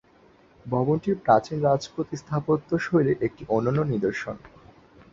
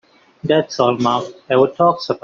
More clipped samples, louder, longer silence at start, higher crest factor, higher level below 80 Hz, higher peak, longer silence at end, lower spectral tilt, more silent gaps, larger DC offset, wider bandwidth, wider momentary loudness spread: neither; second, -25 LUFS vs -17 LUFS; first, 0.65 s vs 0.45 s; first, 20 dB vs 14 dB; about the same, -56 dBFS vs -60 dBFS; about the same, -4 dBFS vs -2 dBFS; first, 0.65 s vs 0.05 s; first, -7.5 dB/octave vs -4.5 dB/octave; neither; neither; about the same, 7.6 kHz vs 7.6 kHz; first, 11 LU vs 5 LU